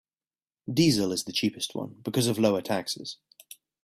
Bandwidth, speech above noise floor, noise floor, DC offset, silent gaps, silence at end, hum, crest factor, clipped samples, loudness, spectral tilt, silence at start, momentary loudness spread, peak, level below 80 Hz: 15.5 kHz; over 63 dB; under -90 dBFS; under 0.1%; none; 0.7 s; none; 18 dB; under 0.1%; -27 LUFS; -4.5 dB/octave; 0.65 s; 13 LU; -10 dBFS; -64 dBFS